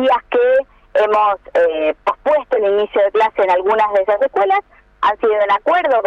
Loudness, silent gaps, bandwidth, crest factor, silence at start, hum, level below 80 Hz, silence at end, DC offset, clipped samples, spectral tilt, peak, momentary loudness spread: -15 LUFS; none; 7.6 kHz; 10 dB; 0 s; none; -52 dBFS; 0 s; under 0.1%; under 0.1%; -4.5 dB/octave; -6 dBFS; 4 LU